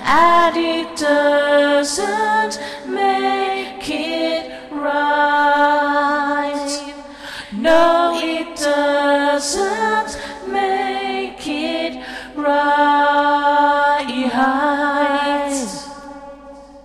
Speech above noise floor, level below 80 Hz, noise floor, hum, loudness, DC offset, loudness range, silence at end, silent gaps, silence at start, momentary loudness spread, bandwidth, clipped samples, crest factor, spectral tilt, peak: 21 dB; -50 dBFS; -39 dBFS; none; -17 LUFS; under 0.1%; 4 LU; 0.05 s; none; 0 s; 13 LU; 13.5 kHz; under 0.1%; 14 dB; -2.5 dB/octave; -2 dBFS